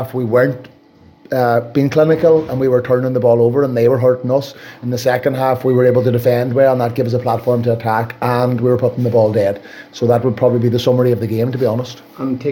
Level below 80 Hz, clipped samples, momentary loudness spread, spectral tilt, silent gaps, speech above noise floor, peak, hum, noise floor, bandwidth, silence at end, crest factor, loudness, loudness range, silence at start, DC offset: -54 dBFS; under 0.1%; 8 LU; -8 dB/octave; none; 32 dB; -2 dBFS; none; -46 dBFS; 17 kHz; 0 s; 12 dB; -15 LUFS; 2 LU; 0 s; under 0.1%